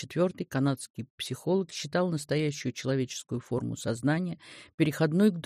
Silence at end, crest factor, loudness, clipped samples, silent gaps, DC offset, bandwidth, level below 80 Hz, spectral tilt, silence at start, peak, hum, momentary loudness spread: 0.05 s; 18 dB; -30 LUFS; under 0.1%; 0.90-0.94 s, 1.10-1.18 s, 4.74-4.78 s; under 0.1%; 15 kHz; -66 dBFS; -6 dB/octave; 0 s; -12 dBFS; none; 10 LU